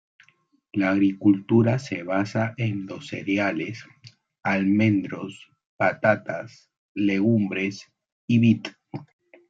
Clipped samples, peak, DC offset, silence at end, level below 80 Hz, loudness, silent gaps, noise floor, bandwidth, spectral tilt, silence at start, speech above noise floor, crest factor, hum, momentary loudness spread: under 0.1%; -6 dBFS; under 0.1%; 0.45 s; -68 dBFS; -24 LUFS; 5.66-5.79 s, 6.78-6.95 s, 8.12-8.28 s; -60 dBFS; 7.8 kHz; -7.5 dB/octave; 0.75 s; 37 dB; 18 dB; none; 18 LU